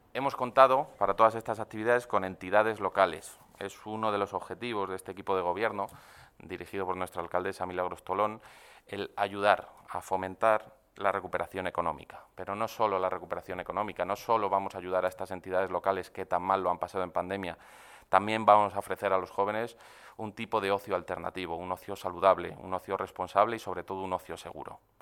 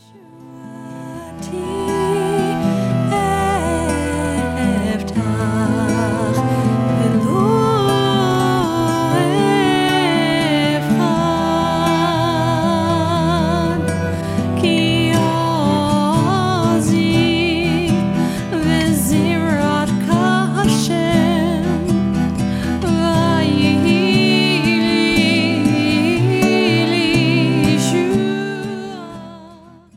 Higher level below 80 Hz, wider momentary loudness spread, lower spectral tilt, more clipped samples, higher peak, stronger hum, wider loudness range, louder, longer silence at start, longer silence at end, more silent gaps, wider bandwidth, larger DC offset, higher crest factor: second, -66 dBFS vs -38 dBFS; first, 14 LU vs 6 LU; about the same, -5 dB/octave vs -5.5 dB/octave; neither; second, -6 dBFS vs -2 dBFS; neither; about the same, 5 LU vs 4 LU; second, -31 LUFS vs -16 LUFS; second, 0.15 s vs 0.35 s; second, 0.25 s vs 0.4 s; neither; about the same, 17.5 kHz vs 16 kHz; neither; first, 26 dB vs 14 dB